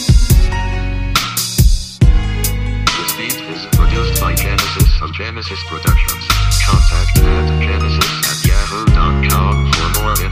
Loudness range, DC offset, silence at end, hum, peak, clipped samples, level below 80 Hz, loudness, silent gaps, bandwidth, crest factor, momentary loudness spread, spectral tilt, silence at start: 2 LU; under 0.1%; 0 s; none; 0 dBFS; under 0.1%; -14 dBFS; -15 LUFS; none; 15.5 kHz; 12 dB; 6 LU; -4 dB/octave; 0 s